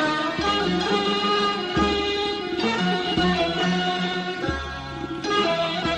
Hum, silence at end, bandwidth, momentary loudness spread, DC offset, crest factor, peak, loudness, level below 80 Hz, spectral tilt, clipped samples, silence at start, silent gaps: none; 0 s; 10 kHz; 6 LU; under 0.1%; 14 dB; -10 dBFS; -23 LUFS; -42 dBFS; -5 dB/octave; under 0.1%; 0 s; none